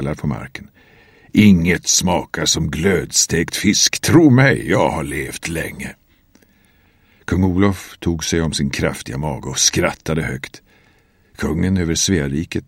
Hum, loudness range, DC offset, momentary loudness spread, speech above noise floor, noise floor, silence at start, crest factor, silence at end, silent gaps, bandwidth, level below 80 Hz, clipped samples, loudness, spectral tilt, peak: none; 7 LU; under 0.1%; 13 LU; 38 dB; -55 dBFS; 0 s; 18 dB; 0.05 s; none; 16.5 kHz; -38 dBFS; under 0.1%; -17 LUFS; -4 dB/octave; 0 dBFS